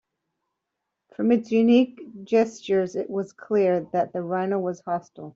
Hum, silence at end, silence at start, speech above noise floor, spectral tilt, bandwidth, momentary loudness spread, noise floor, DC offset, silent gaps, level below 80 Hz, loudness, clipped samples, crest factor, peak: none; 0.05 s; 1.2 s; 59 dB; -7 dB/octave; 7.6 kHz; 11 LU; -82 dBFS; under 0.1%; none; -70 dBFS; -24 LUFS; under 0.1%; 18 dB; -8 dBFS